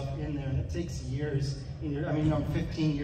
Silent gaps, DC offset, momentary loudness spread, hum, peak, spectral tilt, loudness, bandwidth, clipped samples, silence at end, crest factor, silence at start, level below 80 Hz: none; under 0.1%; 7 LU; none; -16 dBFS; -7.5 dB/octave; -32 LUFS; 9.4 kHz; under 0.1%; 0 s; 14 dB; 0 s; -42 dBFS